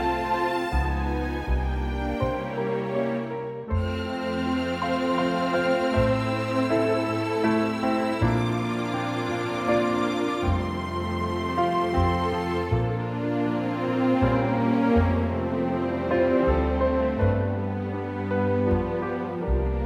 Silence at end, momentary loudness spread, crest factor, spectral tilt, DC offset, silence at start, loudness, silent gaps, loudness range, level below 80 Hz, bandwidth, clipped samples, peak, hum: 0 s; 6 LU; 16 dB; -7.5 dB/octave; under 0.1%; 0 s; -25 LUFS; none; 4 LU; -36 dBFS; 15.5 kHz; under 0.1%; -8 dBFS; none